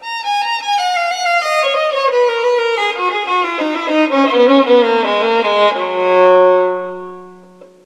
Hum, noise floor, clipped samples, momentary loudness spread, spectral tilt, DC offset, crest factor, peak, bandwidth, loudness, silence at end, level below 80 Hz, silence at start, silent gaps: none; -41 dBFS; under 0.1%; 8 LU; -3 dB/octave; under 0.1%; 14 dB; 0 dBFS; 13 kHz; -13 LUFS; 0.2 s; -70 dBFS; 0 s; none